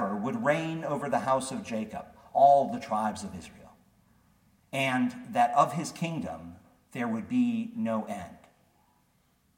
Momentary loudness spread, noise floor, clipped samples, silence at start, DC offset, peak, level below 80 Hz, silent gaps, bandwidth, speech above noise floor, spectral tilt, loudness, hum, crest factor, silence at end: 18 LU; -69 dBFS; under 0.1%; 0 s; under 0.1%; -10 dBFS; -66 dBFS; none; 16.5 kHz; 40 dB; -5.5 dB/octave; -29 LUFS; none; 20 dB; 1.2 s